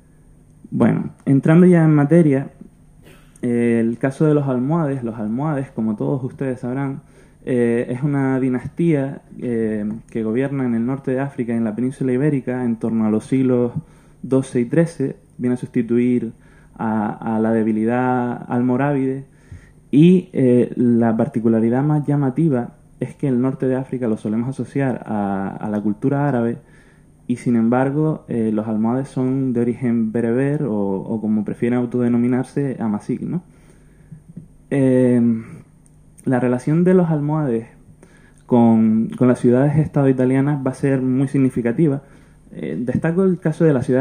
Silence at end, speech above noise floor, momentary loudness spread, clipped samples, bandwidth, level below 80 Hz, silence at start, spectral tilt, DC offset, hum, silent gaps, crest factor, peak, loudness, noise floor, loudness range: 0 s; 31 dB; 10 LU; under 0.1%; 10 kHz; -52 dBFS; 0.7 s; -9.5 dB/octave; under 0.1%; none; none; 18 dB; -2 dBFS; -19 LUFS; -49 dBFS; 5 LU